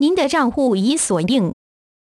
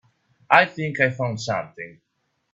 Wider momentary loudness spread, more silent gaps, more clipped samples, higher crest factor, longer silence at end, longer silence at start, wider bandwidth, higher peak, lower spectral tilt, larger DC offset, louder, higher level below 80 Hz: second, 3 LU vs 20 LU; neither; neither; second, 14 dB vs 24 dB; about the same, 0.6 s vs 0.6 s; second, 0 s vs 0.5 s; first, 13 kHz vs 8.4 kHz; second, -4 dBFS vs 0 dBFS; about the same, -4.5 dB/octave vs -5 dB/octave; neither; first, -17 LUFS vs -21 LUFS; first, -50 dBFS vs -64 dBFS